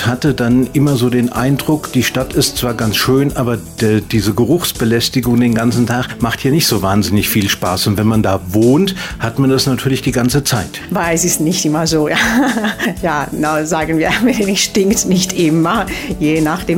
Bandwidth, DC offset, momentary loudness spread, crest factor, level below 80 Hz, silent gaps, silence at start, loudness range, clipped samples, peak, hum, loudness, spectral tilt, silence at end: 16.5 kHz; under 0.1%; 5 LU; 12 dB; -36 dBFS; none; 0 s; 1 LU; under 0.1%; -2 dBFS; none; -14 LUFS; -4.5 dB/octave; 0 s